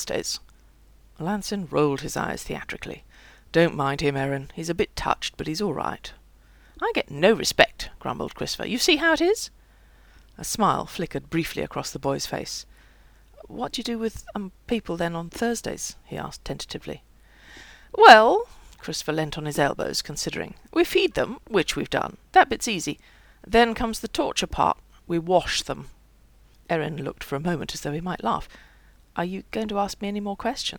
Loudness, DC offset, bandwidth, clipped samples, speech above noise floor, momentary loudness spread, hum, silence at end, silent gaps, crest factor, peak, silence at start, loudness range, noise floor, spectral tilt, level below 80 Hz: -24 LUFS; under 0.1%; over 20 kHz; under 0.1%; 30 dB; 15 LU; none; 0 s; none; 26 dB; 0 dBFS; 0 s; 11 LU; -55 dBFS; -4 dB/octave; -46 dBFS